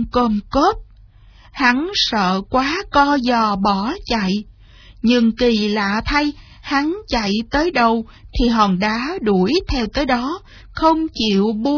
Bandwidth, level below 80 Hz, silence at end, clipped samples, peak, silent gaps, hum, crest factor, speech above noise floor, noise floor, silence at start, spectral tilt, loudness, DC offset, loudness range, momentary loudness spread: 5.4 kHz; -34 dBFS; 0 s; under 0.1%; -2 dBFS; none; none; 16 dB; 28 dB; -45 dBFS; 0 s; -5.5 dB/octave; -18 LUFS; under 0.1%; 1 LU; 7 LU